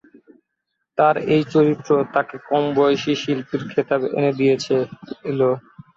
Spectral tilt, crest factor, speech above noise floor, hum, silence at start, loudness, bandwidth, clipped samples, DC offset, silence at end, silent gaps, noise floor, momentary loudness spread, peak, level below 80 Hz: -6.5 dB/octave; 16 dB; 58 dB; none; 0.95 s; -20 LUFS; 7.6 kHz; under 0.1%; under 0.1%; 0.4 s; none; -77 dBFS; 7 LU; -4 dBFS; -62 dBFS